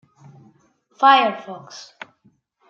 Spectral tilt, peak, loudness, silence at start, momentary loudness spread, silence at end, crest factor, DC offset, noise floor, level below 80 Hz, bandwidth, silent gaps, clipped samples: -3.5 dB/octave; -2 dBFS; -16 LUFS; 1 s; 27 LU; 0.9 s; 20 dB; under 0.1%; -60 dBFS; -82 dBFS; 7.2 kHz; none; under 0.1%